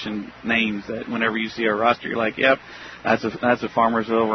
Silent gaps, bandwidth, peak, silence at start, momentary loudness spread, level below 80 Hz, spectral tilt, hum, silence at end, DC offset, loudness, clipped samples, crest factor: none; 6.4 kHz; -4 dBFS; 0 s; 10 LU; -56 dBFS; -6 dB/octave; none; 0 s; under 0.1%; -22 LUFS; under 0.1%; 18 dB